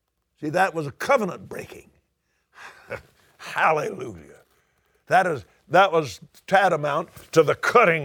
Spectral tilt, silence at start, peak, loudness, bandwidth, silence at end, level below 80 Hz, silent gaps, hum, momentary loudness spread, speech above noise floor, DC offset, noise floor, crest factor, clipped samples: -5 dB/octave; 0.4 s; -4 dBFS; -22 LUFS; 19.5 kHz; 0 s; -64 dBFS; none; none; 20 LU; 51 dB; under 0.1%; -72 dBFS; 20 dB; under 0.1%